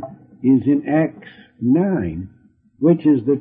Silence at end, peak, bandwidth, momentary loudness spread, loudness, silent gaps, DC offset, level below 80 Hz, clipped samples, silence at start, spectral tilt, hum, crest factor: 0 s; -4 dBFS; 3.7 kHz; 14 LU; -18 LUFS; none; under 0.1%; -52 dBFS; under 0.1%; 0 s; -13.5 dB/octave; none; 14 dB